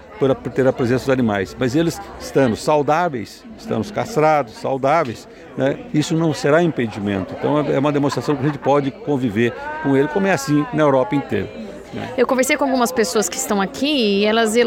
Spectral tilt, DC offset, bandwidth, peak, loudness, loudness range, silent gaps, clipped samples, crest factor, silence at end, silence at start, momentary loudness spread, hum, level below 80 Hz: -5 dB/octave; under 0.1%; 17 kHz; -4 dBFS; -19 LUFS; 1 LU; none; under 0.1%; 14 dB; 0 s; 0 s; 8 LU; none; -50 dBFS